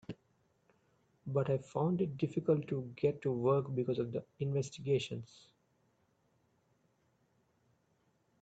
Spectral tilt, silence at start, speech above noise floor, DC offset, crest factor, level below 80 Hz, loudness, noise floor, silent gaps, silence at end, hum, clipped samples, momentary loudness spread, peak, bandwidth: -7.5 dB/octave; 0.1 s; 41 dB; under 0.1%; 20 dB; -74 dBFS; -36 LUFS; -76 dBFS; none; 3.15 s; none; under 0.1%; 12 LU; -18 dBFS; 8.2 kHz